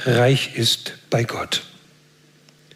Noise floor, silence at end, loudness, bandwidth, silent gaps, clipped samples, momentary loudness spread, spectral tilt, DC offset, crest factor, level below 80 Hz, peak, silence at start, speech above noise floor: -54 dBFS; 1.1 s; -20 LUFS; 16 kHz; none; under 0.1%; 8 LU; -4.5 dB/octave; under 0.1%; 16 dB; -62 dBFS; -6 dBFS; 0 s; 34 dB